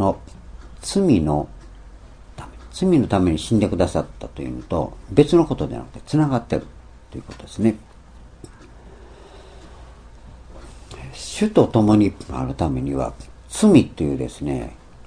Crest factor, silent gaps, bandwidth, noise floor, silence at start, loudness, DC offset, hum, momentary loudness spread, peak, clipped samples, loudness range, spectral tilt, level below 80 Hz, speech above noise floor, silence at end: 22 dB; none; 10.5 kHz; -44 dBFS; 0 s; -20 LUFS; under 0.1%; none; 21 LU; 0 dBFS; under 0.1%; 11 LU; -7 dB/octave; -40 dBFS; 24 dB; 0 s